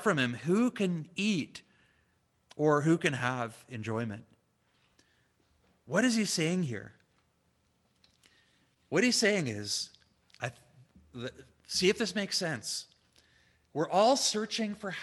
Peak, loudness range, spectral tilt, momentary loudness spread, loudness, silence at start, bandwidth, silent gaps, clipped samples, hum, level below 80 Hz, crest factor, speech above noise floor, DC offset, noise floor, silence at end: -12 dBFS; 3 LU; -4 dB/octave; 16 LU; -30 LUFS; 0 s; 13 kHz; none; under 0.1%; none; -72 dBFS; 20 dB; 43 dB; under 0.1%; -73 dBFS; 0 s